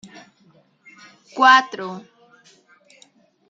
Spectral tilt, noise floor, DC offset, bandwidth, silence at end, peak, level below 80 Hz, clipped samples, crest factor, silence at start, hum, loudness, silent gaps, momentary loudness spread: -2.5 dB/octave; -57 dBFS; under 0.1%; 7.8 kHz; 1.5 s; -2 dBFS; -78 dBFS; under 0.1%; 22 dB; 1.35 s; none; -16 LUFS; none; 24 LU